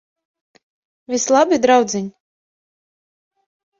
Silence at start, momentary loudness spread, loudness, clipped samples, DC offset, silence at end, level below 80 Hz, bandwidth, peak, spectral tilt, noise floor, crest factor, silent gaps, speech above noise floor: 1.1 s; 12 LU; -16 LUFS; under 0.1%; under 0.1%; 1.7 s; -64 dBFS; 7.8 kHz; -2 dBFS; -3.5 dB/octave; under -90 dBFS; 18 dB; none; over 75 dB